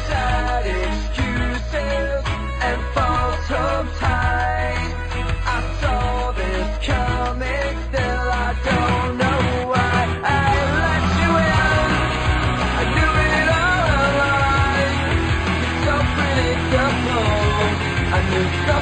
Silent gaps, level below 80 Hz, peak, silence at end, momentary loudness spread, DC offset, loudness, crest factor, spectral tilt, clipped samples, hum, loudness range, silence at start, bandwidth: none; -26 dBFS; -6 dBFS; 0 s; 6 LU; under 0.1%; -19 LUFS; 14 dB; -5.5 dB/octave; under 0.1%; none; 5 LU; 0 s; 9 kHz